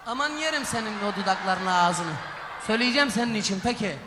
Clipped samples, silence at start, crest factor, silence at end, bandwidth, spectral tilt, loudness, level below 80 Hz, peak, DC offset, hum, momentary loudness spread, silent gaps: under 0.1%; 0 s; 20 dB; 0 s; 13.5 kHz; -3.5 dB/octave; -25 LUFS; -58 dBFS; -6 dBFS; under 0.1%; none; 8 LU; none